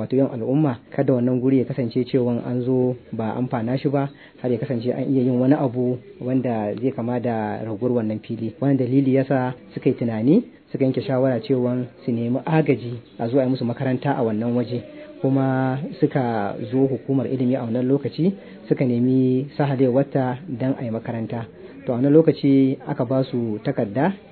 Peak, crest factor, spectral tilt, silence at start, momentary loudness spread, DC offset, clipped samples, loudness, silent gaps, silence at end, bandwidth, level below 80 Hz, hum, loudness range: -2 dBFS; 18 dB; -12.5 dB/octave; 0 s; 9 LU; under 0.1%; under 0.1%; -22 LUFS; none; 0.1 s; 4.5 kHz; -62 dBFS; none; 2 LU